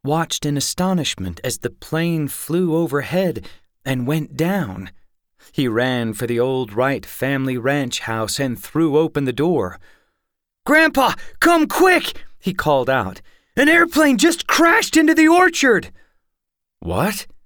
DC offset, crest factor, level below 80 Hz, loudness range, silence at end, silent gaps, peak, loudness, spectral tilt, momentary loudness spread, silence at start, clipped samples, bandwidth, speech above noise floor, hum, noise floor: under 0.1%; 14 dB; -48 dBFS; 8 LU; 0.1 s; none; -4 dBFS; -18 LUFS; -4.5 dB/octave; 12 LU; 0.05 s; under 0.1%; over 20 kHz; 60 dB; none; -78 dBFS